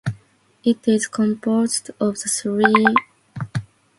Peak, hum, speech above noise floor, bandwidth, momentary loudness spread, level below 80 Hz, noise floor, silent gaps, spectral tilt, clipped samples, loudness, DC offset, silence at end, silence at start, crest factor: 0 dBFS; none; 35 dB; 11.5 kHz; 14 LU; -58 dBFS; -53 dBFS; none; -4.5 dB/octave; under 0.1%; -20 LUFS; under 0.1%; 0.35 s; 0.05 s; 20 dB